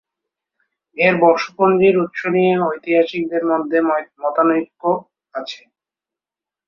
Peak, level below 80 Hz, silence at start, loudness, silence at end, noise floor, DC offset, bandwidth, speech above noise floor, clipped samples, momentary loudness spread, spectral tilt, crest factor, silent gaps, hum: 0 dBFS; -64 dBFS; 0.95 s; -17 LUFS; 1.1 s; -89 dBFS; under 0.1%; 6.8 kHz; 72 dB; under 0.1%; 15 LU; -7 dB/octave; 18 dB; none; none